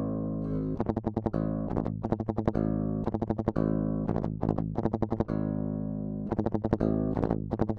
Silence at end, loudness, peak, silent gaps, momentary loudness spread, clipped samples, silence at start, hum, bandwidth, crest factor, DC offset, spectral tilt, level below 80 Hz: 0 s; -31 LUFS; -8 dBFS; none; 4 LU; under 0.1%; 0 s; none; 6 kHz; 22 dB; under 0.1%; -11 dB/octave; -44 dBFS